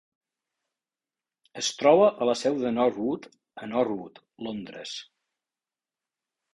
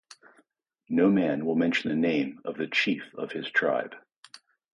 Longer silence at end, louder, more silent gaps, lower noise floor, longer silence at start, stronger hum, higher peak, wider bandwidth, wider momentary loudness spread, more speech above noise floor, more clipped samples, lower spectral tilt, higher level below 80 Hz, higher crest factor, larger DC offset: first, 1.5 s vs 0.35 s; about the same, -25 LUFS vs -27 LUFS; second, none vs 4.17-4.23 s; first, under -90 dBFS vs -69 dBFS; first, 1.55 s vs 0.9 s; neither; first, -6 dBFS vs -10 dBFS; about the same, 11.5 kHz vs 10.5 kHz; first, 19 LU vs 11 LU; first, over 64 dB vs 43 dB; neither; second, -4 dB/octave vs -6 dB/octave; about the same, -68 dBFS vs -70 dBFS; about the same, 22 dB vs 18 dB; neither